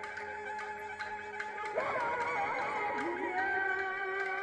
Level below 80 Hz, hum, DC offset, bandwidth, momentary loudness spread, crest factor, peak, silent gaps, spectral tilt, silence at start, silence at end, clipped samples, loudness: -72 dBFS; none; under 0.1%; 12 kHz; 8 LU; 14 dB; -22 dBFS; none; -4 dB/octave; 0 s; 0 s; under 0.1%; -35 LUFS